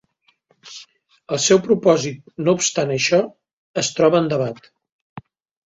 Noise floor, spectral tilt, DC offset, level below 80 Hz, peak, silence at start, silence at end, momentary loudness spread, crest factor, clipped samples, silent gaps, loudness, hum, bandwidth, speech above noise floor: -62 dBFS; -4 dB/octave; under 0.1%; -62 dBFS; -2 dBFS; 0.65 s; 0.45 s; 22 LU; 18 dB; under 0.1%; 3.53-3.74 s, 4.92-5.16 s; -18 LUFS; none; 8 kHz; 44 dB